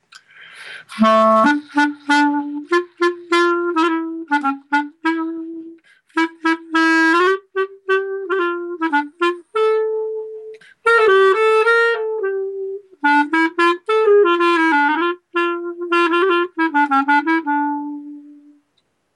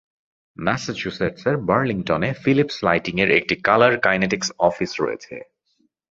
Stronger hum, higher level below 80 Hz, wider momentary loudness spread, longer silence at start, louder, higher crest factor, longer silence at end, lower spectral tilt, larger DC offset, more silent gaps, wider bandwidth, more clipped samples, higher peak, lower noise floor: neither; second, -72 dBFS vs -52 dBFS; first, 13 LU vs 10 LU; second, 0.4 s vs 0.6 s; first, -17 LUFS vs -20 LUFS; second, 14 dB vs 20 dB; first, 0.85 s vs 0.7 s; about the same, -4 dB/octave vs -5 dB/octave; neither; neither; first, 11.5 kHz vs 7.8 kHz; neither; about the same, -4 dBFS vs -2 dBFS; about the same, -66 dBFS vs -67 dBFS